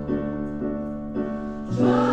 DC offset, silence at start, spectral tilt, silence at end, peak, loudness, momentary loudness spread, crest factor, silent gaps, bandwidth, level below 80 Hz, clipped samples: under 0.1%; 0 s; -8 dB/octave; 0 s; -8 dBFS; -26 LUFS; 9 LU; 18 dB; none; 8.4 kHz; -44 dBFS; under 0.1%